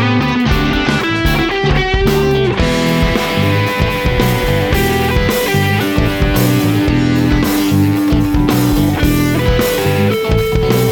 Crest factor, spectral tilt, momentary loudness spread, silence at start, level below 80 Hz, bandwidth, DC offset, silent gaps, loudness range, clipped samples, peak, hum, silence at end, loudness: 12 dB; -6 dB/octave; 1 LU; 0 s; -22 dBFS; 19.5 kHz; under 0.1%; none; 1 LU; under 0.1%; 0 dBFS; none; 0 s; -13 LUFS